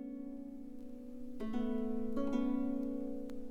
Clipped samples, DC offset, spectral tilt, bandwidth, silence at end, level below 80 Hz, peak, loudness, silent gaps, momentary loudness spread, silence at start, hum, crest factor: under 0.1%; under 0.1%; -8 dB/octave; 7.4 kHz; 0 s; -54 dBFS; -24 dBFS; -40 LUFS; none; 14 LU; 0 s; none; 14 dB